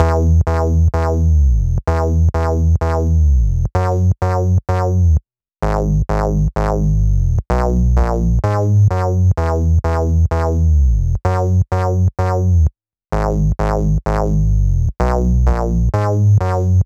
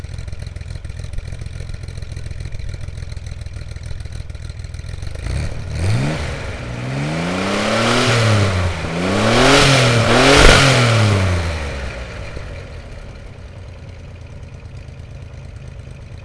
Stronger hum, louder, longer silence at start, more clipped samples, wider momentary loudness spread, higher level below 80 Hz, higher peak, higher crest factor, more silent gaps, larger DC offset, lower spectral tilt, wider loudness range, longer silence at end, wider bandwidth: neither; about the same, -16 LUFS vs -15 LUFS; about the same, 0 s vs 0 s; neither; second, 4 LU vs 25 LU; first, -18 dBFS vs -28 dBFS; about the same, 0 dBFS vs 0 dBFS; about the same, 14 dB vs 18 dB; neither; neither; first, -8.5 dB/octave vs -4.5 dB/octave; second, 2 LU vs 21 LU; about the same, 0 s vs 0 s; second, 7.8 kHz vs 11 kHz